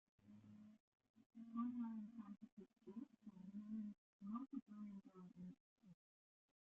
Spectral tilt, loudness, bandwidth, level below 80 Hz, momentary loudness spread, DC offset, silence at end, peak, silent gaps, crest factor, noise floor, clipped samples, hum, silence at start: -9 dB/octave; -55 LUFS; 4.1 kHz; under -90 dBFS; 17 LU; under 0.1%; 0.8 s; -36 dBFS; 0.80-0.92 s, 1.09-1.14 s, 1.26-1.30 s, 2.52-2.57 s, 3.98-4.20 s, 4.62-4.66 s, 5.60-5.76 s; 18 dB; under -90 dBFS; under 0.1%; none; 0.2 s